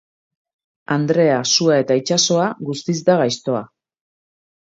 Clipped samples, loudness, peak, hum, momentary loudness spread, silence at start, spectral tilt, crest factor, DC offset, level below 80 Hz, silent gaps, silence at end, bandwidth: under 0.1%; -17 LUFS; -2 dBFS; none; 9 LU; 0.9 s; -4 dB/octave; 18 dB; under 0.1%; -66 dBFS; none; 1 s; 7.8 kHz